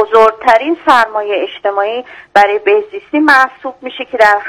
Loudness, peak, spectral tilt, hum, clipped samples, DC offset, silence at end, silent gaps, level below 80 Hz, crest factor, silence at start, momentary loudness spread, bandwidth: -11 LUFS; 0 dBFS; -3.5 dB/octave; none; 2%; under 0.1%; 0 s; none; -52 dBFS; 12 dB; 0 s; 13 LU; 16.5 kHz